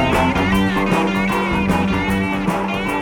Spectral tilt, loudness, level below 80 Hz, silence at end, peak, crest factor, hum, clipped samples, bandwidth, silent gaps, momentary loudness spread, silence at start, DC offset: -6 dB/octave; -18 LUFS; -32 dBFS; 0 s; -6 dBFS; 12 dB; none; under 0.1%; 18 kHz; none; 4 LU; 0 s; under 0.1%